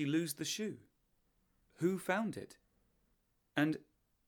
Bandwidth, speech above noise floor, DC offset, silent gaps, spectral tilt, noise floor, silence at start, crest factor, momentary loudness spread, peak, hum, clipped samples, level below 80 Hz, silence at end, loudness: 20 kHz; 41 dB; under 0.1%; none; -4.5 dB/octave; -78 dBFS; 0 s; 22 dB; 12 LU; -18 dBFS; none; under 0.1%; -78 dBFS; 0.5 s; -38 LUFS